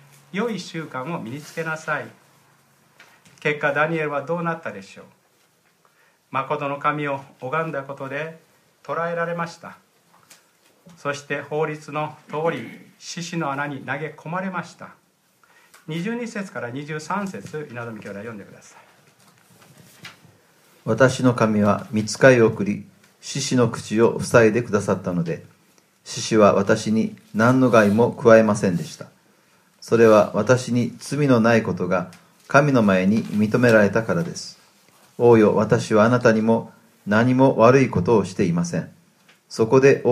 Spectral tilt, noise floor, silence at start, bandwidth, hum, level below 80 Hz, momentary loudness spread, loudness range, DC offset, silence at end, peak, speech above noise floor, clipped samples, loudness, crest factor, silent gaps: -6 dB/octave; -61 dBFS; 0.35 s; 14.5 kHz; none; -62 dBFS; 18 LU; 13 LU; under 0.1%; 0 s; 0 dBFS; 41 dB; under 0.1%; -20 LUFS; 22 dB; none